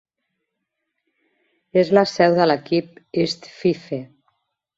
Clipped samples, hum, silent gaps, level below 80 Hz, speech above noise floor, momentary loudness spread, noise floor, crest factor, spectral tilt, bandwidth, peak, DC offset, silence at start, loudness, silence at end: under 0.1%; none; none; -64 dBFS; 59 dB; 12 LU; -78 dBFS; 20 dB; -6 dB/octave; 7.8 kHz; -2 dBFS; under 0.1%; 1.75 s; -20 LUFS; 0.7 s